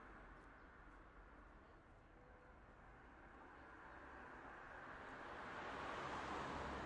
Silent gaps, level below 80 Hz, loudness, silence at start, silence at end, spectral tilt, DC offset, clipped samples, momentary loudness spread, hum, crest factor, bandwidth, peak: none; -66 dBFS; -54 LUFS; 0 s; 0 s; -5 dB/octave; under 0.1%; under 0.1%; 17 LU; none; 20 dB; 10.5 kHz; -36 dBFS